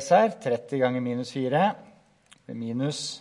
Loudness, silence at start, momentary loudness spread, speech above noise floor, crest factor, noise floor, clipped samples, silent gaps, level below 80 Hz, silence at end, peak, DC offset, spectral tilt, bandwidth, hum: -26 LUFS; 0 s; 13 LU; 33 dB; 20 dB; -59 dBFS; under 0.1%; none; -76 dBFS; 0 s; -6 dBFS; under 0.1%; -5.5 dB/octave; 11.5 kHz; none